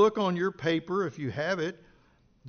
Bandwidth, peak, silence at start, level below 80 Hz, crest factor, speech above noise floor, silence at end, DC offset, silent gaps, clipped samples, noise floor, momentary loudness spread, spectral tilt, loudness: 6.6 kHz; -12 dBFS; 0 s; -66 dBFS; 18 dB; 34 dB; 0 s; under 0.1%; none; under 0.1%; -63 dBFS; 5 LU; -4.5 dB/octave; -30 LUFS